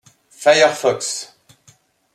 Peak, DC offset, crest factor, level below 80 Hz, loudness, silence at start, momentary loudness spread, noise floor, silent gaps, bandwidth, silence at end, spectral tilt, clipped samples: -2 dBFS; under 0.1%; 18 dB; -70 dBFS; -16 LUFS; 0.4 s; 15 LU; -54 dBFS; none; 14.5 kHz; 0.9 s; -2 dB/octave; under 0.1%